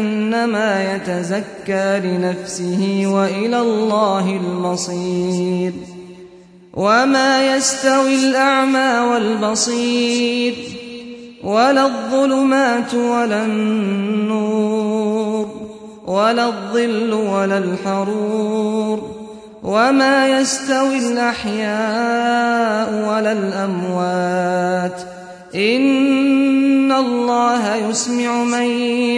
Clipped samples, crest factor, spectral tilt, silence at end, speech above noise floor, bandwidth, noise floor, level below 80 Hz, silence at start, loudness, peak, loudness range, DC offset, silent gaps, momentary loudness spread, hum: under 0.1%; 14 dB; -4.5 dB/octave; 0 s; 26 dB; 11 kHz; -42 dBFS; -58 dBFS; 0 s; -17 LUFS; -2 dBFS; 4 LU; under 0.1%; none; 9 LU; none